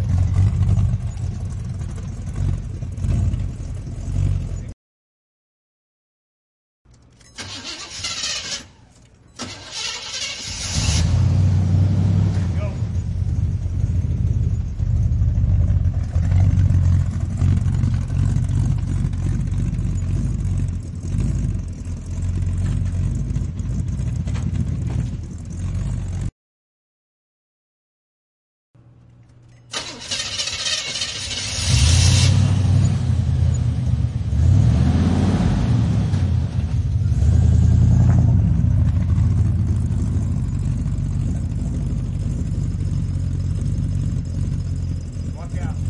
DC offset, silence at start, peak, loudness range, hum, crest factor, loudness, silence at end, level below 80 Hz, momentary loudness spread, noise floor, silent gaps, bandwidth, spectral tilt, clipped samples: under 0.1%; 0 s; -4 dBFS; 12 LU; none; 16 dB; -21 LUFS; 0 s; -28 dBFS; 12 LU; -49 dBFS; 4.73-6.85 s, 26.32-28.74 s; 11.5 kHz; -5.5 dB/octave; under 0.1%